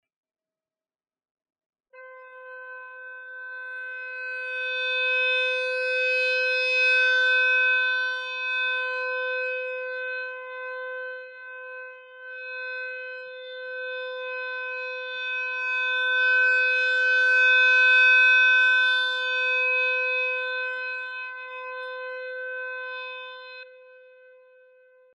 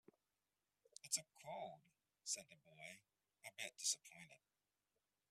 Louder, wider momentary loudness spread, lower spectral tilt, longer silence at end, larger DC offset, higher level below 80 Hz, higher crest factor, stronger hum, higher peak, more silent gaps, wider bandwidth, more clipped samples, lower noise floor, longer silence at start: first, -22 LUFS vs -48 LUFS; about the same, 22 LU vs 21 LU; second, 4 dB/octave vs 0.5 dB/octave; first, 1.15 s vs 0.95 s; neither; about the same, under -90 dBFS vs under -90 dBFS; second, 14 dB vs 26 dB; neither; first, -12 dBFS vs -28 dBFS; neither; second, 10.5 kHz vs 15.5 kHz; neither; about the same, under -90 dBFS vs under -90 dBFS; first, 1.95 s vs 1.05 s